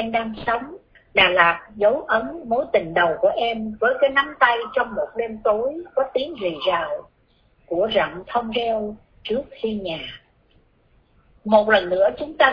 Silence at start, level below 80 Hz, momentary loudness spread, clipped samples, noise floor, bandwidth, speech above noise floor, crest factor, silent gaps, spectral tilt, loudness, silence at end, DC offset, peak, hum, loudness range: 0 s; -52 dBFS; 11 LU; under 0.1%; -60 dBFS; 5.4 kHz; 39 dB; 22 dB; none; -6.5 dB/octave; -21 LUFS; 0 s; under 0.1%; 0 dBFS; none; 6 LU